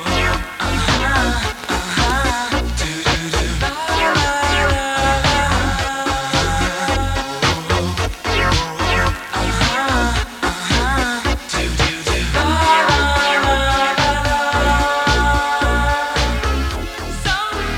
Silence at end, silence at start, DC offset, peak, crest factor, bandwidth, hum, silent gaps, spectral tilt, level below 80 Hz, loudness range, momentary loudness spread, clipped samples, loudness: 0 s; 0 s; under 0.1%; -2 dBFS; 14 dB; 17.5 kHz; none; none; -4 dB/octave; -24 dBFS; 3 LU; 6 LU; under 0.1%; -17 LUFS